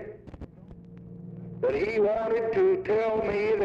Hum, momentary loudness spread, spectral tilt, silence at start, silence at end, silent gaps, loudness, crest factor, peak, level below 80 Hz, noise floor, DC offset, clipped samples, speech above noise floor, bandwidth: none; 22 LU; -8 dB/octave; 0 s; 0 s; none; -26 LUFS; 12 dB; -16 dBFS; -54 dBFS; -47 dBFS; under 0.1%; under 0.1%; 22 dB; 7.2 kHz